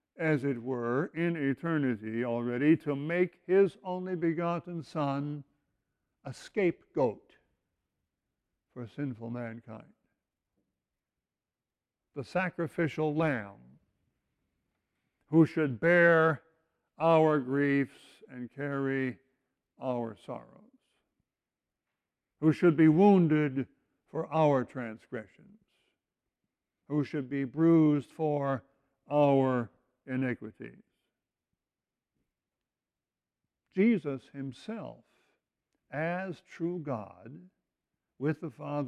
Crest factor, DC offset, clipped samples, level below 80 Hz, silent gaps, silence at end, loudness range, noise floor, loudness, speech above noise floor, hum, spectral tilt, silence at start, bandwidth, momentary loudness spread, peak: 20 dB; under 0.1%; under 0.1%; -74 dBFS; none; 0 s; 15 LU; under -90 dBFS; -30 LUFS; over 61 dB; none; -8.5 dB/octave; 0.2 s; 9.8 kHz; 20 LU; -12 dBFS